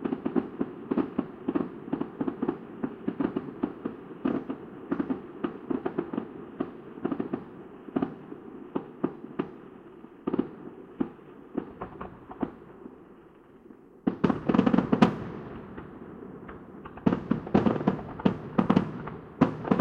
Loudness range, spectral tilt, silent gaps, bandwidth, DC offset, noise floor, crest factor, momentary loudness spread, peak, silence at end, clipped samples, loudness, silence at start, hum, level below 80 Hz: 9 LU; -9 dB/octave; none; 7.4 kHz; under 0.1%; -53 dBFS; 26 dB; 19 LU; -4 dBFS; 0 s; under 0.1%; -31 LUFS; 0 s; none; -56 dBFS